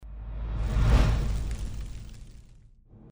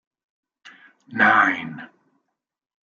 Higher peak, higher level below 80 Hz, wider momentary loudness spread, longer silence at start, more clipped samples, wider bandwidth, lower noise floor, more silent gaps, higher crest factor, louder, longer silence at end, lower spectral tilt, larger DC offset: second, -10 dBFS vs -4 dBFS; first, -30 dBFS vs -76 dBFS; about the same, 21 LU vs 20 LU; second, 0 s vs 0.65 s; neither; first, over 20 kHz vs 7.2 kHz; second, -53 dBFS vs -78 dBFS; neither; about the same, 18 dB vs 22 dB; second, -29 LUFS vs -18 LUFS; second, 0.05 s vs 1.05 s; first, -6.5 dB/octave vs -5 dB/octave; neither